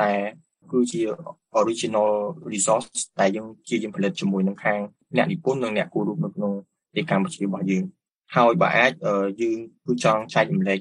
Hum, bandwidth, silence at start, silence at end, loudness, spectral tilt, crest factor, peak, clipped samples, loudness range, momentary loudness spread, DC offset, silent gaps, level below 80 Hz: none; 11 kHz; 0 s; 0 s; -23 LUFS; -5 dB/octave; 20 dB; -4 dBFS; under 0.1%; 3 LU; 9 LU; under 0.1%; 8.18-8.22 s; -68 dBFS